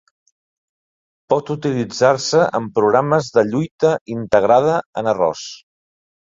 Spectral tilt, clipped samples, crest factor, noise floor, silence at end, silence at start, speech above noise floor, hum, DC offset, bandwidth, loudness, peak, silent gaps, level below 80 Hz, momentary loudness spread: -5.5 dB/octave; under 0.1%; 18 dB; under -90 dBFS; 0.8 s; 1.3 s; over 73 dB; none; under 0.1%; 7.8 kHz; -17 LUFS; -2 dBFS; 3.71-3.79 s, 4.01-4.06 s, 4.86-4.93 s; -56 dBFS; 7 LU